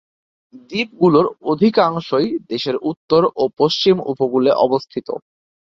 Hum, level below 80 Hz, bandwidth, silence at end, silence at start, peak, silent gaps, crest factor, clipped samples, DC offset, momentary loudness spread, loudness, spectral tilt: none; -58 dBFS; 7.2 kHz; 0.4 s; 0.55 s; -2 dBFS; 2.97-3.08 s; 16 dB; under 0.1%; under 0.1%; 10 LU; -17 LUFS; -6.5 dB/octave